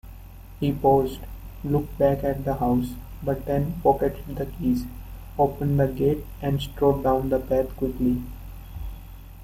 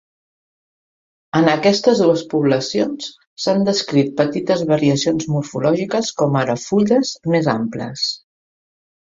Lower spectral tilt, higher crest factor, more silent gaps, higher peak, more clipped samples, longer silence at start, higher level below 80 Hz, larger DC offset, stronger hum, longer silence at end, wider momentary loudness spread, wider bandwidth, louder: first, -8.5 dB/octave vs -5.5 dB/octave; about the same, 18 dB vs 18 dB; second, none vs 3.27-3.37 s; second, -6 dBFS vs 0 dBFS; neither; second, 0.05 s vs 1.35 s; first, -38 dBFS vs -58 dBFS; neither; neither; second, 0 s vs 0.85 s; first, 17 LU vs 8 LU; first, 16 kHz vs 7.8 kHz; second, -25 LUFS vs -18 LUFS